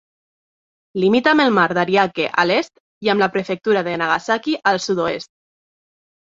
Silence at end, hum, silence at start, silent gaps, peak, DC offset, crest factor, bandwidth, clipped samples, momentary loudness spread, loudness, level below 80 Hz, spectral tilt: 1.1 s; none; 0.95 s; 2.80-3.01 s; 0 dBFS; under 0.1%; 18 dB; 7.8 kHz; under 0.1%; 9 LU; -18 LUFS; -62 dBFS; -5 dB/octave